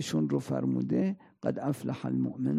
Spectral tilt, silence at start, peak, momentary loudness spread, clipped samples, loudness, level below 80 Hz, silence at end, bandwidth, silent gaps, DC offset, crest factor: -7 dB/octave; 0 s; -14 dBFS; 5 LU; under 0.1%; -31 LUFS; -72 dBFS; 0 s; 15 kHz; none; under 0.1%; 16 dB